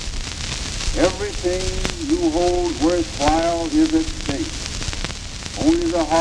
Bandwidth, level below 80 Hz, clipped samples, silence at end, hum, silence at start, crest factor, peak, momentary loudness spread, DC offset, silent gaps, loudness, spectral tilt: 12 kHz; -30 dBFS; under 0.1%; 0 s; none; 0 s; 20 dB; 0 dBFS; 8 LU; under 0.1%; none; -21 LUFS; -4.5 dB/octave